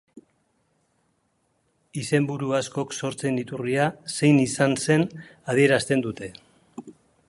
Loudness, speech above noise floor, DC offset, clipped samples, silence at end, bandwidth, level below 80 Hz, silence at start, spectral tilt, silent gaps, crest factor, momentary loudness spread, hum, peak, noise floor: -24 LUFS; 47 dB; under 0.1%; under 0.1%; 0.35 s; 11.5 kHz; -64 dBFS; 0.15 s; -5.5 dB/octave; none; 20 dB; 18 LU; none; -4 dBFS; -70 dBFS